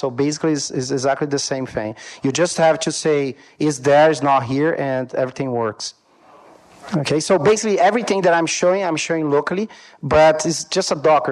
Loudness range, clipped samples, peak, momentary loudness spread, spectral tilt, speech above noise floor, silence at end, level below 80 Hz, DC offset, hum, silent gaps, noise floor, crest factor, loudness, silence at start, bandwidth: 3 LU; under 0.1%; -2 dBFS; 11 LU; -4.5 dB/octave; 30 dB; 0 s; -52 dBFS; under 0.1%; none; none; -48 dBFS; 16 dB; -18 LUFS; 0 s; 12 kHz